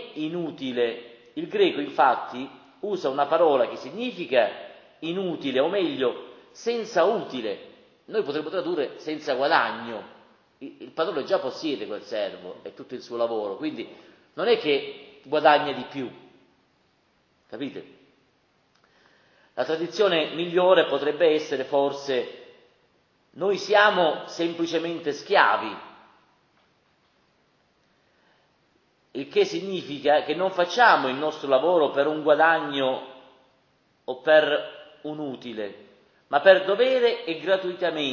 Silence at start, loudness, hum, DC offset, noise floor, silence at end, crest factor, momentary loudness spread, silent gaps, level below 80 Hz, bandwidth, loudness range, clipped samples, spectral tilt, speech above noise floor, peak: 0 s; -24 LUFS; none; under 0.1%; -66 dBFS; 0 s; 24 dB; 19 LU; none; -78 dBFS; 7.2 kHz; 8 LU; under 0.1%; -4.5 dB/octave; 42 dB; -2 dBFS